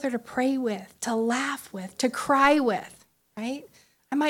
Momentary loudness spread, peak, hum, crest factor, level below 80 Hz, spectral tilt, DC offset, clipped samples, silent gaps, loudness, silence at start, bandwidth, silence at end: 16 LU; -6 dBFS; none; 20 dB; -64 dBFS; -4 dB/octave; under 0.1%; under 0.1%; none; -26 LUFS; 0 s; 16.5 kHz; 0 s